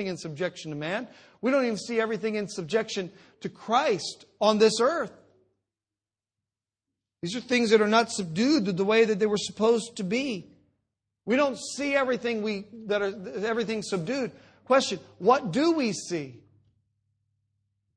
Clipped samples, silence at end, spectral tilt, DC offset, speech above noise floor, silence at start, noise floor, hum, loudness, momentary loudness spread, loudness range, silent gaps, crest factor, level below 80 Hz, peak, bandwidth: under 0.1%; 1.6 s; -4.5 dB/octave; under 0.1%; over 64 dB; 0 s; under -90 dBFS; none; -26 LUFS; 12 LU; 5 LU; none; 22 dB; -70 dBFS; -6 dBFS; 10 kHz